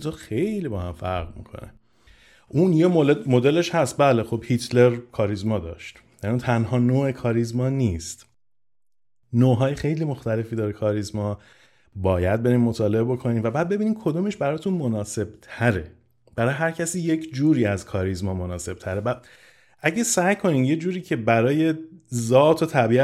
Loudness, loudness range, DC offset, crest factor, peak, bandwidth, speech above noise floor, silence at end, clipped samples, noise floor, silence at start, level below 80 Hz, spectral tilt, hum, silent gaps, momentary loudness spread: -23 LUFS; 4 LU; under 0.1%; 18 dB; -4 dBFS; 14 kHz; 66 dB; 0 s; under 0.1%; -88 dBFS; 0 s; -52 dBFS; -6.5 dB/octave; none; none; 12 LU